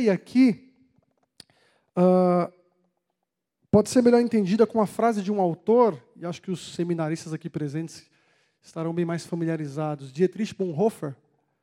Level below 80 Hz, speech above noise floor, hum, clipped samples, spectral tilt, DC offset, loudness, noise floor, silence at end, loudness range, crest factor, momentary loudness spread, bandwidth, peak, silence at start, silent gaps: -64 dBFS; 59 dB; none; under 0.1%; -7 dB/octave; under 0.1%; -24 LUFS; -82 dBFS; 0.5 s; 8 LU; 20 dB; 14 LU; 13.5 kHz; -6 dBFS; 0 s; none